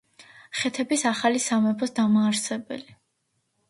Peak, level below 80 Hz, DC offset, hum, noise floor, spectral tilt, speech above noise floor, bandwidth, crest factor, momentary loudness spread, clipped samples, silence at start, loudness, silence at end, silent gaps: -8 dBFS; -70 dBFS; under 0.1%; none; -74 dBFS; -3.5 dB/octave; 50 dB; 11.5 kHz; 18 dB; 12 LU; under 0.1%; 0.2 s; -24 LUFS; 0.85 s; none